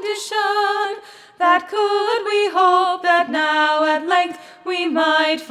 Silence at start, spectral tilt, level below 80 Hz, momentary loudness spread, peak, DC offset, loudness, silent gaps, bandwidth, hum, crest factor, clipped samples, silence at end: 0 s; -1.5 dB/octave; -80 dBFS; 7 LU; -2 dBFS; under 0.1%; -18 LUFS; none; 14 kHz; none; 16 dB; under 0.1%; 0 s